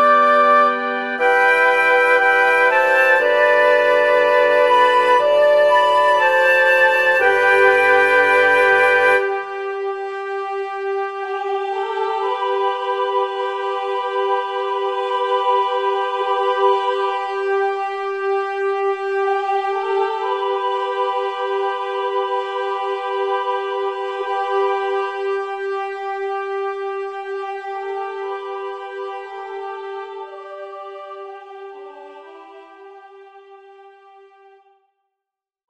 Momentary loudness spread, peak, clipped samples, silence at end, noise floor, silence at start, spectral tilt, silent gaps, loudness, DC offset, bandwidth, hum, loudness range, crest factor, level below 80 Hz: 16 LU; -2 dBFS; under 0.1%; 1.8 s; -85 dBFS; 0 s; -2.5 dB/octave; none; -17 LUFS; under 0.1%; 13.5 kHz; none; 16 LU; 16 dB; -70 dBFS